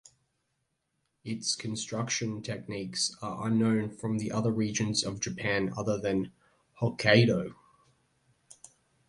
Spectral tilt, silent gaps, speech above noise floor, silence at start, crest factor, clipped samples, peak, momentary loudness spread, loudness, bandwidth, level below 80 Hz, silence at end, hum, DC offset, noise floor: -4.5 dB/octave; none; 50 dB; 1.25 s; 24 dB; under 0.1%; -6 dBFS; 13 LU; -30 LUFS; 11.5 kHz; -62 dBFS; 1.55 s; none; under 0.1%; -79 dBFS